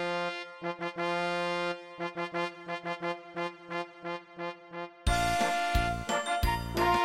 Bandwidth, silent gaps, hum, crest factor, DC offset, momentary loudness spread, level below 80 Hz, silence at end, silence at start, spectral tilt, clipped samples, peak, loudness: 16 kHz; none; none; 16 dB; under 0.1%; 11 LU; -42 dBFS; 0 s; 0 s; -4.5 dB/octave; under 0.1%; -16 dBFS; -33 LUFS